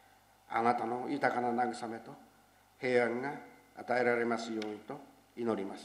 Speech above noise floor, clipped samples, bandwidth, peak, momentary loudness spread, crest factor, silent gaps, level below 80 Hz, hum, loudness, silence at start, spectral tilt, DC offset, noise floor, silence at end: 30 dB; under 0.1%; 15 kHz; -14 dBFS; 17 LU; 22 dB; none; -78 dBFS; none; -34 LUFS; 0.5 s; -5.5 dB/octave; under 0.1%; -64 dBFS; 0 s